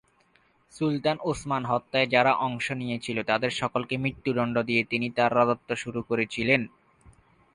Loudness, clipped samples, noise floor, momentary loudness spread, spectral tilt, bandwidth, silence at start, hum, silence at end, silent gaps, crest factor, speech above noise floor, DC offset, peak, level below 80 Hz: -26 LUFS; under 0.1%; -64 dBFS; 8 LU; -5.5 dB/octave; 11 kHz; 0.75 s; none; 0.9 s; none; 22 dB; 38 dB; under 0.1%; -6 dBFS; -60 dBFS